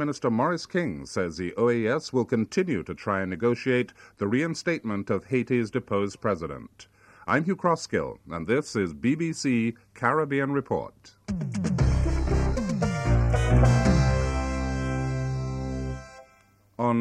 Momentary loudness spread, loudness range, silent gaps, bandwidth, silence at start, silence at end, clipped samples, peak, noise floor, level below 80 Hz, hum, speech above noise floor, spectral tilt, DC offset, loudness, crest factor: 8 LU; 4 LU; none; 10.5 kHz; 0 s; 0 s; under 0.1%; -8 dBFS; -60 dBFS; -34 dBFS; none; 33 dB; -6.5 dB/octave; under 0.1%; -27 LUFS; 18 dB